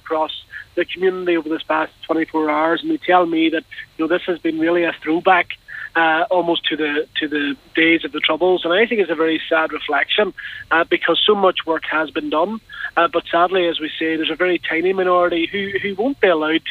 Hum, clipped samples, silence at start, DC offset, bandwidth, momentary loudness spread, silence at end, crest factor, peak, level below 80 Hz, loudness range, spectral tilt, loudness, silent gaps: none; under 0.1%; 0.05 s; under 0.1%; 4.8 kHz; 7 LU; 0 s; 18 dB; 0 dBFS; -56 dBFS; 2 LU; -6 dB/octave; -18 LUFS; none